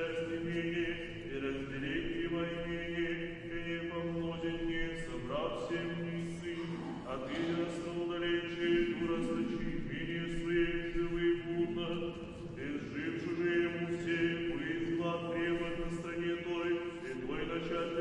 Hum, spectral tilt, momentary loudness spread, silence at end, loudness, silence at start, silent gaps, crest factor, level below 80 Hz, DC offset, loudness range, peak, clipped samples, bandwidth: none; -6.5 dB/octave; 7 LU; 0 s; -37 LUFS; 0 s; none; 14 dB; -52 dBFS; under 0.1%; 3 LU; -22 dBFS; under 0.1%; 10 kHz